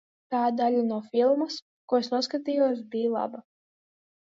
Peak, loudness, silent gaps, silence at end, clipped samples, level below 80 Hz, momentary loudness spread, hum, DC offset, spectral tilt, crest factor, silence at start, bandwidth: -12 dBFS; -27 LUFS; 1.62-1.88 s; 0.8 s; under 0.1%; -82 dBFS; 9 LU; none; under 0.1%; -5 dB/octave; 16 dB; 0.3 s; 7.8 kHz